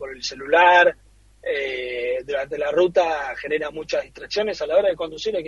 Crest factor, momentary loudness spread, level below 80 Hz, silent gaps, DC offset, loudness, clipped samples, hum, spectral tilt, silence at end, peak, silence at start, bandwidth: 18 dB; 12 LU; -54 dBFS; none; under 0.1%; -21 LUFS; under 0.1%; none; -3 dB/octave; 0 s; -4 dBFS; 0 s; 7.4 kHz